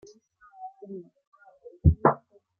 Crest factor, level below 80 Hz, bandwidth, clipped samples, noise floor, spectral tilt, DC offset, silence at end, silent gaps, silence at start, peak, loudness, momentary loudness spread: 24 dB; -40 dBFS; 6.4 kHz; under 0.1%; -56 dBFS; -10.5 dB/octave; under 0.1%; 0.45 s; 1.27-1.32 s; 0.6 s; -6 dBFS; -25 LUFS; 23 LU